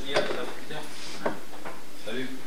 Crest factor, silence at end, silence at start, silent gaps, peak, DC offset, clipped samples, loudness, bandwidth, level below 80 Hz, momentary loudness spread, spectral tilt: 24 dB; 0 s; 0 s; none; -10 dBFS; 5%; under 0.1%; -34 LUFS; 16 kHz; -70 dBFS; 13 LU; -3.5 dB/octave